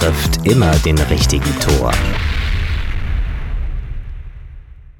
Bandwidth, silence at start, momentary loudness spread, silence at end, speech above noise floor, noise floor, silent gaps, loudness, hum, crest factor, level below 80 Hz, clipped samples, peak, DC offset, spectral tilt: 18 kHz; 0 s; 17 LU; 0.05 s; 22 dB; -35 dBFS; none; -16 LUFS; none; 16 dB; -20 dBFS; under 0.1%; 0 dBFS; under 0.1%; -5 dB/octave